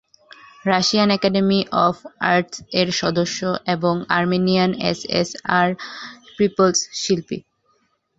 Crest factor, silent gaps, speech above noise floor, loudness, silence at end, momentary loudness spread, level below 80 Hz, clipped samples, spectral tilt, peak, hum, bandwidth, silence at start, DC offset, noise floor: 20 dB; none; 45 dB; -19 LUFS; 0.8 s; 7 LU; -56 dBFS; under 0.1%; -4.5 dB/octave; 0 dBFS; none; 8 kHz; 0.65 s; under 0.1%; -65 dBFS